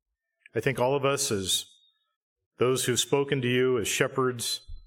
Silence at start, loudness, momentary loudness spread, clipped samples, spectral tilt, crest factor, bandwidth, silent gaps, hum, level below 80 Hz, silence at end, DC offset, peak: 0.55 s; -26 LUFS; 6 LU; under 0.1%; -3.5 dB/octave; 20 dB; 17 kHz; 2.16-2.36 s, 2.46-2.51 s; none; -56 dBFS; 0.05 s; under 0.1%; -8 dBFS